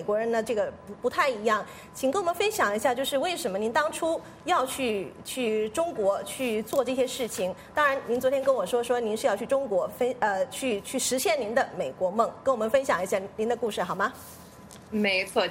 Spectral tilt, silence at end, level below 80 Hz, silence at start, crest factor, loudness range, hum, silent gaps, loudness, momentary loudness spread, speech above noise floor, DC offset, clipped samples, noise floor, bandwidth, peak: -3 dB/octave; 0 s; -64 dBFS; 0 s; 18 dB; 2 LU; none; none; -27 LUFS; 6 LU; 20 dB; under 0.1%; under 0.1%; -47 dBFS; 16 kHz; -10 dBFS